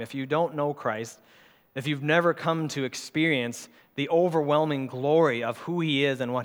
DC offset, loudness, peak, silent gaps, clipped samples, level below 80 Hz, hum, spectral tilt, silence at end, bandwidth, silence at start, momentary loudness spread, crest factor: under 0.1%; -26 LUFS; -8 dBFS; none; under 0.1%; -78 dBFS; none; -5.5 dB/octave; 0 s; 18 kHz; 0 s; 11 LU; 20 dB